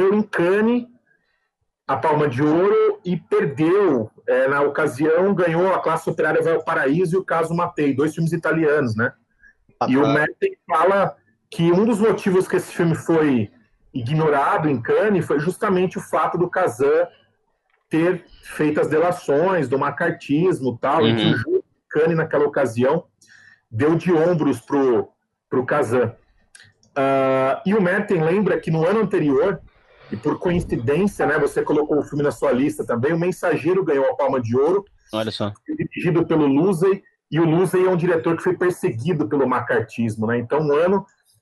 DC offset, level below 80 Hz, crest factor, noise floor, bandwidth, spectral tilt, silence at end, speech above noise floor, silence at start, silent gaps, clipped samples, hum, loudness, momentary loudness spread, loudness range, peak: under 0.1%; -54 dBFS; 16 dB; -73 dBFS; 12 kHz; -7 dB/octave; 0.4 s; 54 dB; 0 s; none; under 0.1%; none; -20 LUFS; 7 LU; 2 LU; -4 dBFS